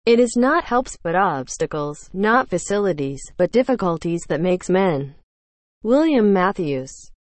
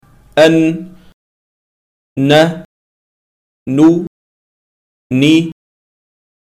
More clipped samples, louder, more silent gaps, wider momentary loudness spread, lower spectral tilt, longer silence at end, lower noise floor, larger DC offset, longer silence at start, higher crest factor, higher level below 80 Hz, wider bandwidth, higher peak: neither; second, -20 LUFS vs -12 LUFS; second, 5.23-5.81 s vs 1.14-2.16 s, 2.65-3.66 s, 4.07-5.10 s; second, 11 LU vs 18 LU; about the same, -5.5 dB/octave vs -6 dB/octave; second, 0.25 s vs 0.95 s; about the same, under -90 dBFS vs under -90 dBFS; neither; second, 0.05 s vs 0.35 s; about the same, 16 dB vs 14 dB; first, -48 dBFS vs -54 dBFS; second, 8.8 kHz vs 13 kHz; second, -4 dBFS vs 0 dBFS